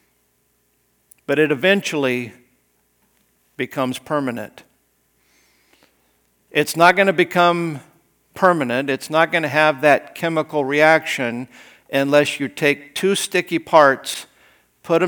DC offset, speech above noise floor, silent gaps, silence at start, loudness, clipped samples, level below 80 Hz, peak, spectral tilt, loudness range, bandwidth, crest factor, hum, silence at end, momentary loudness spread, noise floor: under 0.1%; 47 dB; none; 1.3 s; -18 LUFS; under 0.1%; -70 dBFS; 0 dBFS; -4.5 dB/octave; 11 LU; over 20 kHz; 20 dB; none; 0 s; 13 LU; -64 dBFS